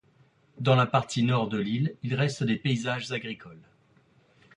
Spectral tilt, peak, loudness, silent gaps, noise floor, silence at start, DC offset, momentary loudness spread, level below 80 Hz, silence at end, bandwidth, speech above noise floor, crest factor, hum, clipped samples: -6 dB/octave; -8 dBFS; -27 LUFS; none; -63 dBFS; 0.55 s; under 0.1%; 10 LU; -66 dBFS; 0.95 s; 10.5 kHz; 36 dB; 20 dB; none; under 0.1%